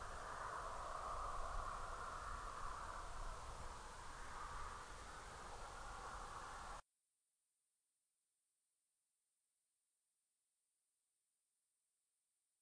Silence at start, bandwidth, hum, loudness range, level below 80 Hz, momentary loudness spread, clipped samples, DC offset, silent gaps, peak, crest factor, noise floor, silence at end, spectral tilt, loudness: 0 s; 10.5 kHz; none; 9 LU; -58 dBFS; 7 LU; under 0.1%; under 0.1%; none; -34 dBFS; 18 dB; under -90 dBFS; 5.8 s; -3 dB/octave; -51 LUFS